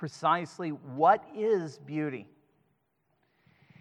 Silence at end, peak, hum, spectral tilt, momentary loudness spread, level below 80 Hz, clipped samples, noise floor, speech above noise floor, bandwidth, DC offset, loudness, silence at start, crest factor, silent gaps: 1.55 s; -10 dBFS; none; -6.5 dB/octave; 12 LU; -88 dBFS; under 0.1%; -75 dBFS; 46 dB; 10.5 kHz; under 0.1%; -29 LUFS; 0 s; 22 dB; none